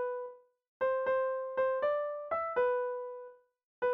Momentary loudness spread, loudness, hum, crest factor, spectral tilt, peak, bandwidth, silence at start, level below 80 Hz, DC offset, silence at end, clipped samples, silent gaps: 13 LU; -33 LUFS; none; 14 dB; -1 dB/octave; -20 dBFS; 4 kHz; 0 s; -74 dBFS; under 0.1%; 0 s; under 0.1%; 0.68-0.80 s, 3.64-3.82 s